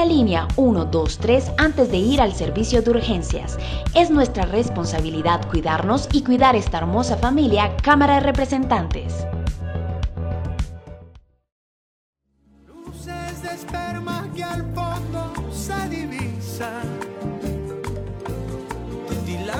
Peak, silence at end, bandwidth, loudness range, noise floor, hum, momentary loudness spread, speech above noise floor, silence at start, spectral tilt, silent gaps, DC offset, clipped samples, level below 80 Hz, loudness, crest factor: -2 dBFS; 0 s; 16.5 kHz; 14 LU; -56 dBFS; none; 14 LU; 38 dB; 0 s; -6 dB/octave; 11.52-12.13 s; under 0.1%; under 0.1%; -30 dBFS; -21 LUFS; 18 dB